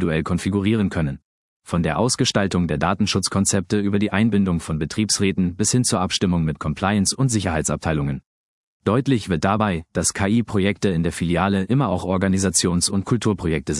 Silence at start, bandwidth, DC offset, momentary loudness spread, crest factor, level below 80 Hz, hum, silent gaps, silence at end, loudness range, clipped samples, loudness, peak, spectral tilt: 0 s; 12 kHz; under 0.1%; 5 LU; 18 dB; -44 dBFS; none; 1.22-1.60 s, 8.26-8.80 s; 0 s; 2 LU; under 0.1%; -20 LUFS; -2 dBFS; -4.5 dB/octave